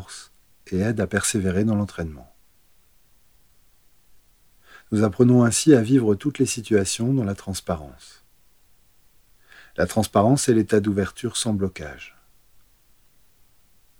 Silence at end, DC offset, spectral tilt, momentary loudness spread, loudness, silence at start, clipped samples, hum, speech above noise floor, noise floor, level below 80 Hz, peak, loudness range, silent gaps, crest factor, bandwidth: 1.9 s; 0.1%; -5.5 dB/octave; 18 LU; -21 LUFS; 0 s; under 0.1%; none; 39 dB; -60 dBFS; -54 dBFS; -4 dBFS; 9 LU; none; 20 dB; over 20 kHz